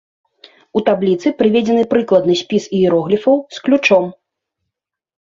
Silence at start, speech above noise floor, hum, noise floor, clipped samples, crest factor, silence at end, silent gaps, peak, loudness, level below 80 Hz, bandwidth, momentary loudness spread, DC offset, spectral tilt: 0.75 s; 66 dB; none; -80 dBFS; under 0.1%; 14 dB; 1.2 s; none; 0 dBFS; -15 LUFS; -58 dBFS; 7.6 kHz; 5 LU; under 0.1%; -6 dB/octave